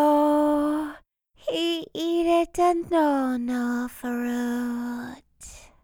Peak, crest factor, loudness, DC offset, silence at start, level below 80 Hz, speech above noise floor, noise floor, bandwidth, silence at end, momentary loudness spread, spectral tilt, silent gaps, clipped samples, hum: -10 dBFS; 14 dB; -25 LUFS; under 0.1%; 0 s; -54 dBFS; 32 dB; -56 dBFS; 19 kHz; 0.25 s; 15 LU; -4 dB/octave; none; under 0.1%; none